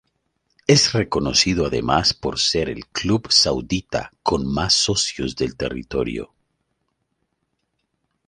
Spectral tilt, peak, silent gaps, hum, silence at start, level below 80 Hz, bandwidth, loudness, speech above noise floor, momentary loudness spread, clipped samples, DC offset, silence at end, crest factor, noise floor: -3.5 dB/octave; -2 dBFS; none; none; 0.7 s; -42 dBFS; 11.5 kHz; -19 LUFS; 53 dB; 10 LU; under 0.1%; under 0.1%; 2 s; 20 dB; -74 dBFS